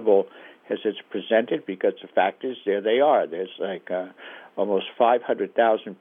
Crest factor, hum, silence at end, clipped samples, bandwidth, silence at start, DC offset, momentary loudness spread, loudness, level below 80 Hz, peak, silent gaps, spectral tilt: 18 dB; none; 0.05 s; under 0.1%; 3.8 kHz; 0 s; under 0.1%; 12 LU; -24 LUFS; under -90 dBFS; -6 dBFS; none; -8 dB/octave